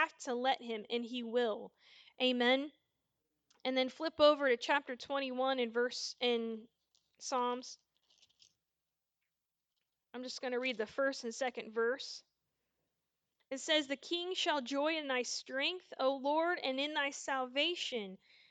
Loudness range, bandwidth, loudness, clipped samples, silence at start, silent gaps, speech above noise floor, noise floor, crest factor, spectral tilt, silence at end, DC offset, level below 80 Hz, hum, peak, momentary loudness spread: 10 LU; 9.2 kHz; -35 LUFS; under 0.1%; 0 s; none; 54 dB; -90 dBFS; 22 dB; -2 dB/octave; 0.35 s; under 0.1%; -84 dBFS; none; -16 dBFS; 12 LU